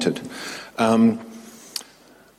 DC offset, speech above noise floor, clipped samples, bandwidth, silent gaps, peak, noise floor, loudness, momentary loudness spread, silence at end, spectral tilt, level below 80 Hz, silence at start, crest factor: under 0.1%; 31 dB; under 0.1%; 15 kHz; none; -6 dBFS; -51 dBFS; -23 LUFS; 18 LU; 0.55 s; -5 dB/octave; -64 dBFS; 0 s; 18 dB